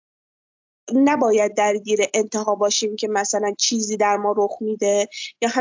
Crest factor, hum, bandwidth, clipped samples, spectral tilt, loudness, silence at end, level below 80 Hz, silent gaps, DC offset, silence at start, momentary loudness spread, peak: 16 dB; none; 7.6 kHz; under 0.1%; -2.5 dB/octave; -20 LUFS; 0 s; -82 dBFS; none; under 0.1%; 0.85 s; 5 LU; -4 dBFS